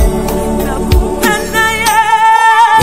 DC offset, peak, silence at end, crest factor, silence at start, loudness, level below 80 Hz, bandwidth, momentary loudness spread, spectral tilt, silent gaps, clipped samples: 2%; 0 dBFS; 0 s; 10 dB; 0 s; -10 LUFS; -18 dBFS; 16.5 kHz; 9 LU; -4 dB/octave; none; 0.4%